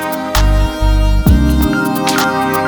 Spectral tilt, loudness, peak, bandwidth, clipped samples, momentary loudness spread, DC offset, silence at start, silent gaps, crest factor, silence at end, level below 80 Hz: -5.5 dB/octave; -13 LUFS; 0 dBFS; over 20 kHz; under 0.1%; 3 LU; under 0.1%; 0 s; none; 10 dB; 0 s; -14 dBFS